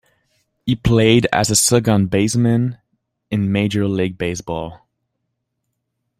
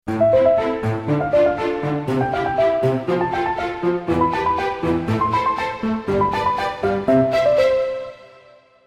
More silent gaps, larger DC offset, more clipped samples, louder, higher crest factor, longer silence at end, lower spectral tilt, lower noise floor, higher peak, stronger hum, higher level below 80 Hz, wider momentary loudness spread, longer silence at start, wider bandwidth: neither; neither; neither; about the same, -17 LUFS vs -19 LUFS; about the same, 18 dB vs 14 dB; first, 1.45 s vs 0.6 s; second, -5 dB/octave vs -7.5 dB/octave; first, -75 dBFS vs -49 dBFS; first, 0 dBFS vs -4 dBFS; neither; about the same, -42 dBFS vs -44 dBFS; first, 12 LU vs 7 LU; first, 0.65 s vs 0.05 s; first, 16 kHz vs 13 kHz